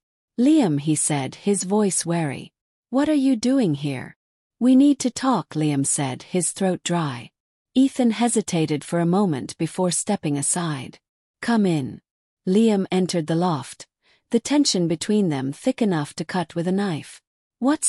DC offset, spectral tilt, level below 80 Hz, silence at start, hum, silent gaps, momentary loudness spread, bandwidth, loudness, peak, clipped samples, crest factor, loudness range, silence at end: under 0.1%; -5 dB/octave; -64 dBFS; 0.4 s; none; 2.61-2.83 s, 4.16-4.50 s, 7.40-7.65 s, 11.09-11.34 s, 12.11-12.37 s, 17.27-17.50 s; 11 LU; 13.5 kHz; -22 LUFS; -6 dBFS; under 0.1%; 16 dB; 2 LU; 0 s